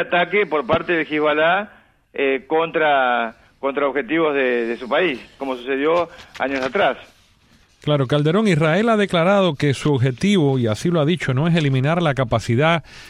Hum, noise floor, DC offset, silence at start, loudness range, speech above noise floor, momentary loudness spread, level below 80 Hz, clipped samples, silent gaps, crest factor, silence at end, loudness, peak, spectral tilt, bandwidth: none; -55 dBFS; under 0.1%; 0 s; 4 LU; 36 dB; 7 LU; -50 dBFS; under 0.1%; none; 14 dB; 0 s; -19 LUFS; -4 dBFS; -6.5 dB/octave; 11.5 kHz